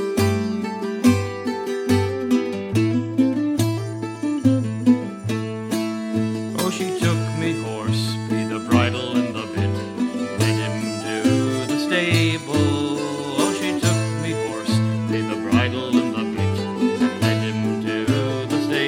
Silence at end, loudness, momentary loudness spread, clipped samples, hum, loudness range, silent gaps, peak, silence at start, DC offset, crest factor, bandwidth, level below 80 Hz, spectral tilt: 0 s; -22 LUFS; 6 LU; under 0.1%; none; 2 LU; none; -2 dBFS; 0 s; under 0.1%; 18 dB; 16.5 kHz; -58 dBFS; -5.5 dB/octave